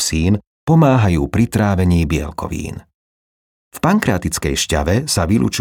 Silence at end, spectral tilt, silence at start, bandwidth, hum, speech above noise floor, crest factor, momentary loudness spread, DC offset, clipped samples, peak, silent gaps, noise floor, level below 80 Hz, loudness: 0 s; -5.5 dB/octave; 0 s; 18.5 kHz; none; over 75 dB; 14 dB; 12 LU; under 0.1%; under 0.1%; -2 dBFS; 0.47-0.67 s, 2.94-3.71 s; under -90 dBFS; -34 dBFS; -16 LUFS